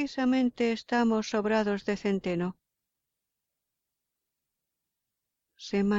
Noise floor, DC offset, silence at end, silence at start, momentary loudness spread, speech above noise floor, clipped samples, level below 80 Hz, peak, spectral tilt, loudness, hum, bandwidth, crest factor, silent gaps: -86 dBFS; under 0.1%; 0 s; 0 s; 7 LU; 58 dB; under 0.1%; -64 dBFS; -16 dBFS; -6 dB/octave; -29 LUFS; none; 7.8 kHz; 16 dB; none